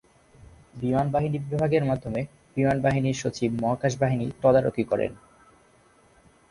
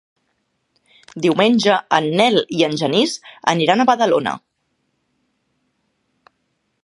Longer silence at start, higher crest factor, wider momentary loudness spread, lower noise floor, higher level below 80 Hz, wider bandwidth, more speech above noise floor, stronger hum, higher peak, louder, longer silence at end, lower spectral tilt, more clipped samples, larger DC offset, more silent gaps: second, 0.75 s vs 1.15 s; about the same, 18 dB vs 20 dB; about the same, 9 LU vs 7 LU; second, -59 dBFS vs -70 dBFS; first, -52 dBFS vs -66 dBFS; about the same, 11 kHz vs 11.5 kHz; second, 34 dB vs 53 dB; neither; second, -8 dBFS vs 0 dBFS; second, -25 LUFS vs -16 LUFS; second, 1.35 s vs 2.45 s; first, -7 dB/octave vs -4.5 dB/octave; neither; neither; neither